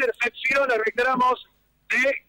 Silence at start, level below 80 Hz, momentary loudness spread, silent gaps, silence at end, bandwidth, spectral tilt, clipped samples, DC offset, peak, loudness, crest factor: 0 s; -60 dBFS; 4 LU; none; 0.1 s; 16 kHz; -3 dB/octave; under 0.1%; under 0.1%; -14 dBFS; -22 LUFS; 10 dB